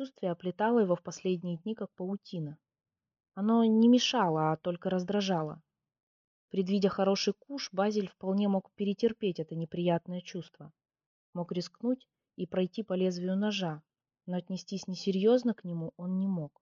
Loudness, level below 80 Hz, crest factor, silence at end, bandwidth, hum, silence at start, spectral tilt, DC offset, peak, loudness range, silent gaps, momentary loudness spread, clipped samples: -31 LUFS; -76 dBFS; 16 dB; 0.15 s; 7.4 kHz; none; 0 s; -5.5 dB/octave; under 0.1%; -14 dBFS; 6 LU; 6.03-6.48 s, 11.06-11.33 s; 13 LU; under 0.1%